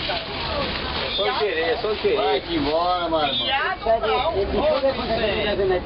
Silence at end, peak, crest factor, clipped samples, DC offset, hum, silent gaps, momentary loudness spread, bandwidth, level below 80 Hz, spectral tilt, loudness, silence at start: 0 s; -10 dBFS; 12 dB; under 0.1%; under 0.1%; none; none; 4 LU; 5.8 kHz; -38 dBFS; -8.5 dB/octave; -22 LUFS; 0 s